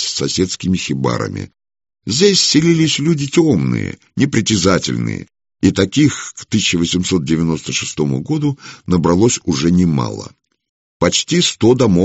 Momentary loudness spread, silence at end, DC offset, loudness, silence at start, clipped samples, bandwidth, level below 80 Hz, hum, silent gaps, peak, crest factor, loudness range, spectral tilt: 12 LU; 0 s; under 0.1%; -15 LUFS; 0 s; under 0.1%; 8.2 kHz; -44 dBFS; none; 10.69-11.00 s; 0 dBFS; 16 dB; 3 LU; -4.5 dB/octave